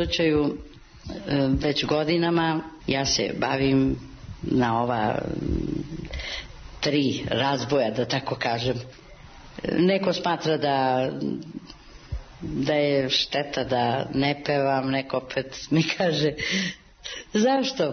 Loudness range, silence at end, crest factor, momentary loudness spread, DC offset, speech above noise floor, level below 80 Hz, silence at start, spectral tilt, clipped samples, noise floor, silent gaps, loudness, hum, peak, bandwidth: 2 LU; 0 s; 16 dB; 14 LU; under 0.1%; 21 dB; -44 dBFS; 0 s; -5 dB/octave; under 0.1%; -45 dBFS; none; -25 LUFS; none; -10 dBFS; 6.6 kHz